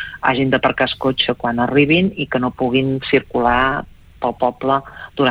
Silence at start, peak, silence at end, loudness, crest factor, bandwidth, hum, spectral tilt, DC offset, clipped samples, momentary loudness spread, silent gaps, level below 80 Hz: 0 s; -2 dBFS; 0 s; -17 LUFS; 16 dB; 5.2 kHz; none; -8 dB/octave; under 0.1%; under 0.1%; 6 LU; none; -42 dBFS